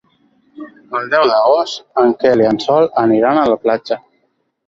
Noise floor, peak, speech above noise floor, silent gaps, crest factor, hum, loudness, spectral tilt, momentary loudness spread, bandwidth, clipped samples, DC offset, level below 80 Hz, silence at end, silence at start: -64 dBFS; -2 dBFS; 51 dB; none; 14 dB; none; -14 LUFS; -5.5 dB/octave; 10 LU; 7.6 kHz; under 0.1%; under 0.1%; -54 dBFS; 0.7 s; 0.6 s